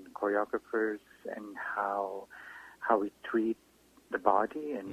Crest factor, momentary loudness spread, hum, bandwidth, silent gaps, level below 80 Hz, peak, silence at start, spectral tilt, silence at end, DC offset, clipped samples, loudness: 24 dB; 14 LU; none; 15 kHz; none; -72 dBFS; -10 dBFS; 0 s; -6 dB/octave; 0 s; under 0.1%; under 0.1%; -33 LUFS